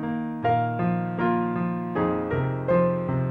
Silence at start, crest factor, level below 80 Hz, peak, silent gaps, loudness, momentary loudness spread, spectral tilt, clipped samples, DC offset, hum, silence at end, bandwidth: 0 s; 14 dB; -52 dBFS; -10 dBFS; none; -25 LUFS; 5 LU; -10.5 dB/octave; under 0.1%; under 0.1%; none; 0 s; 4.3 kHz